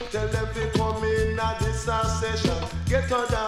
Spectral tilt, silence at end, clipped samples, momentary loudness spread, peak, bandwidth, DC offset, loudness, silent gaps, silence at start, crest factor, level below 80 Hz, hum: -5 dB/octave; 0 s; under 0.1%; 3 LU; -8 dBFS; 14 kHz; under 0.1%; -26 LUFS; none; 0 s; 16 dB; -34 dBFS; none